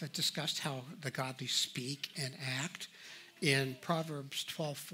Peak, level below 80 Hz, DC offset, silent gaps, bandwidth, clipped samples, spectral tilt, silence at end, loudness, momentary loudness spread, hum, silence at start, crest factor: -14 dBFS; -80 dBFS; under 0.1%; none; 16 kHz; under 0.1%; -3 dB/octave; 0 s; -37 LUFS; 10 LU; none; 0 s; 24 dB